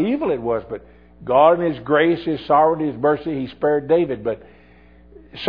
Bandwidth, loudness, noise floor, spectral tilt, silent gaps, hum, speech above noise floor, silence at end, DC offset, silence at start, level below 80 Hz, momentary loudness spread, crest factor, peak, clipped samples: 5.2 kHz; -19 LUFS; -49 dBFS; -9 dB/octave; none; none; 30 dB; 0 s; 0.2%; 0 s; -50 dBFS; 12 LU; 18 dB; -2 dBFS; under 0.1%